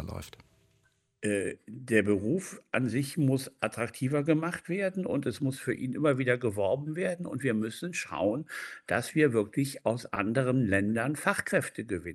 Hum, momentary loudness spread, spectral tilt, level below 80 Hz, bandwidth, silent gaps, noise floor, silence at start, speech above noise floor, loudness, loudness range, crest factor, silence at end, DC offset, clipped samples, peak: none; 9 LU; -6 dB/octave; -64 dBFS; 13 kHz; none; -71 dBFS; 0 s; 41 dB; -30 LUFS; 2 LU; 20 dB; 0 s; under 0.1%; under 0.1%; -10 dBFS